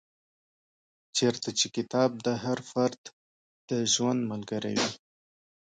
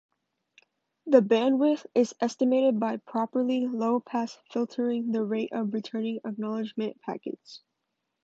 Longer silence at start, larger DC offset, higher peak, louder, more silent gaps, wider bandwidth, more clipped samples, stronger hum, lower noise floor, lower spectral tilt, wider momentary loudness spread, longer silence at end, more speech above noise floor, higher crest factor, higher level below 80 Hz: about the same, 1.15 s vs 1.05 s; neither; second, -12 dBFS vs -6 dBFS; about the same, -29 LUFS vs -27 LUFS; first, 2.98-3.04 s, 3.13-3.68 s vs none; first, 9.4 kHz vs 8 kHz; neither; neither; first, under -90 dBFS vs -82 dBFS; second, -3.5 dB/octave vs -6 dB/octave; second, 8 LU vs 11 LU; first, 0.8 s vs 0.65 s; first, over 61 dB vs 55 dB; about the same, 20 dB vs 22 dB; first, -72 dBFS vs -80 dBFS